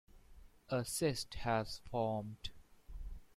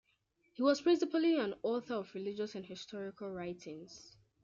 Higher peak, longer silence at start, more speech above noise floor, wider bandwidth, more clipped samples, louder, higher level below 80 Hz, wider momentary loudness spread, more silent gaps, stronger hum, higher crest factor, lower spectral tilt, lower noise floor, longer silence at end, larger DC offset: second, -22 dBFS vs -18 dBFS; second, 0.15 s vs 0.6 s; second, 21 dB vs 41 dB; first, 16.5 kHz vs 7.4 kHz; neither; second, -39 LUFS vs -36 LUFS; first, -54 dBFS vs -78 dBFS; about the same, 17 LU vs 18 LU; neither; neither; about the same, 18 dB vs 18 dB; about the same, -4.5 dB/octave vs -5 dB/octave; second, -60 dBFS vs -77 dBFS; second, 0.1 s vs 0.35 s; neither